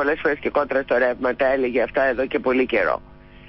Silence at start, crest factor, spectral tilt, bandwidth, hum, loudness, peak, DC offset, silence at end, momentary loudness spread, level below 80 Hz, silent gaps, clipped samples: 0 s; 12 dB; -9.5 dB/octave; 5.8 kHz; none; -21 LUFS; -8 dBFS; under 0.1%; 0 s; 3 LU; -48 dBFS; none; under 0.1%